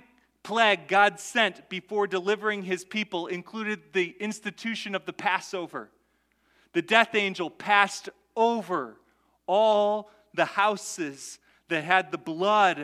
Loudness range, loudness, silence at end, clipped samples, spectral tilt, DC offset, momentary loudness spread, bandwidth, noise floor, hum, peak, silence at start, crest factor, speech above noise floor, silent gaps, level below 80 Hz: 5 LU; -26 LUFS; 0 s; under 0.1%; -3.5 dB/octave; under 0.1%; 13 LU; 14.5 kHz; -70 dBFS; none; -4 dBFS; 0.45 s; 24 dB; 44 dB; none; -78 dBFS